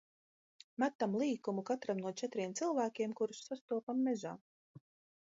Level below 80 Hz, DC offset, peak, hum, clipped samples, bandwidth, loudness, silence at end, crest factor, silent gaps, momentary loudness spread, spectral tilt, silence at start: -88 dBFS; under 0.1%; -20 dBFS; none; under 0.1%; 7.6 kHz; -38 LUFS; 0.45 s; 20 dB; 0.95-0.99 s, 3.61-3.68 s, 3.83-3.87 s, 4.41-4.75 s; 7 LU; -5 dB/octave; 0.8 s